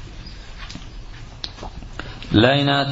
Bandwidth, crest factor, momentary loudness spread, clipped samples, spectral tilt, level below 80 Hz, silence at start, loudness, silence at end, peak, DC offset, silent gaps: 7.8 kHz; 22 dB; 23 LU; under 0.1%; -6 dB/octave; -38 dBFS; 0 s; -18 LUFS; 0 s; 0 dBFS; under 0.1%; none